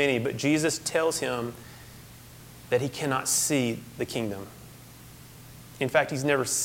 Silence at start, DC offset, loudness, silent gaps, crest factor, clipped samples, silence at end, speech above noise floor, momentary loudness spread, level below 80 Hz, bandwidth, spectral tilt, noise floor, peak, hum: 0 s; under 0.1%; -27 LUFS; none; 22 dB; under 0.1%; 0 s; 21 dB; 23 LU; -58 dBFS; 17 kHz; -3.5 dB/octave; -48 dBFS; -8 dBFS; none